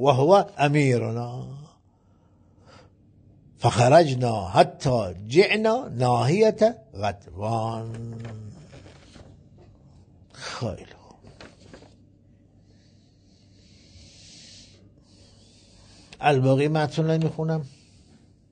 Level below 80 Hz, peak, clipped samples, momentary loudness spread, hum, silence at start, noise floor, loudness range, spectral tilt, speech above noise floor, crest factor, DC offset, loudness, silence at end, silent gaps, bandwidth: -58 dBFS; -4 dBFS; under 0.1%; 21 LU; none; 0 s; -59 dBFS; 19 LU; -6.5 dB/octave; 37 dB; 22 dB; under 0.1%; -22 LUFS; 0.85 s; none; 9.4 kHz